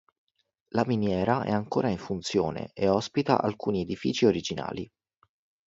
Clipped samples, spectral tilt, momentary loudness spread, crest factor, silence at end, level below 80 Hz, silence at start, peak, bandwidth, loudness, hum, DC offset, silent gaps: under 0.1%; -6 dB/octave; 8 LU; 22 dB; 0.8 s; -56 dBFS; 0.75 s; -6 dBFS; 7.8 kHz; -28 LUFS; none; under 0.1%; none